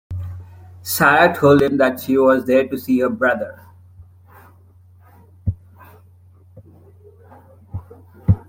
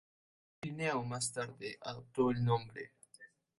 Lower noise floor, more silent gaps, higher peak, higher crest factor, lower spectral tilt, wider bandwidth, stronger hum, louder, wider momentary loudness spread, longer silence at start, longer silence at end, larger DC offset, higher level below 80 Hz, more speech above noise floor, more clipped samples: second, -48 dBFS vs -62 dBFS; neither; first, -2 dBFS vs -20 dBFS; about the same, 18 dB vs 18 dB; about the same, -6 dB/octave vs -5 dB/octave; first, 16.5 kHz vs 11.5 kHz; neither; first, -16 LUFS vs -37 LUFS; first, 22 LU vs 17 LU; second, 0.1 s vs 0.65 s; second, 0.1 s vs 0.35 s; neither; first, -46 dBFS vs -68 dBFS; first, 33 dB vs 25 dB; neither